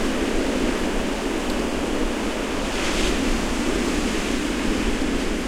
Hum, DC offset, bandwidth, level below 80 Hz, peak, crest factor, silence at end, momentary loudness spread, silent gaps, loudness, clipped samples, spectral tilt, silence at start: none; under 0.1%; 16.5 kHz; -30 dBFS; -8 dBFS; 14 dB; 0 s; 3 LU; none; -24 LUFS; under 0.1%; -4 dB/octave; 0 s